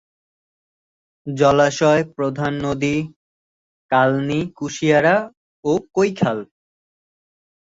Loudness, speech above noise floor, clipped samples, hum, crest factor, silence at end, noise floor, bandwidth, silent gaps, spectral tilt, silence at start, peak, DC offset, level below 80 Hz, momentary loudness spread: -19 LUFS; over 72 dB; under 0.1%; none; 18 dB; 1.2 s; under -90 dBFS; 7.8 kHz; 3.16-3.89 s, 5.37-5.63 s; -6 dB/octave; 1.25 s; -2 dBFS; under 0.1%; -54 dBFS; 13 LU